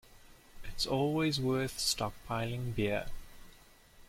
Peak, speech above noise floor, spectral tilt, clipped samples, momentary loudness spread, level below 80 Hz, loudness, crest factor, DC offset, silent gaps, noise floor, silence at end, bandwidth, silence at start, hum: -16 dBFS; 25 dB; -4.5 dB/octave; under 0.1%; 18 LU; -50 dBFS; -33 LUFS; 18 dB; under 0.1%; none; -59 dBFS; 0.05 s; 16.5 kHz; 0.1 s; none